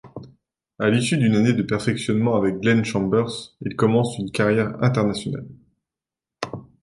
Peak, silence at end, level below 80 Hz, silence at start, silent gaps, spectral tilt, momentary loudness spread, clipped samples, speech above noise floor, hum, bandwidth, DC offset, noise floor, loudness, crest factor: -4 dBFS; 0.2 s; -54 dBFS; 0.05 s; none; -6.5 dB/octave; 14 LU; under 0.1%; 68 dB; none; 11.5 kHz; under 0.1%; -88 dBFS; -21 LUFS; 18 dB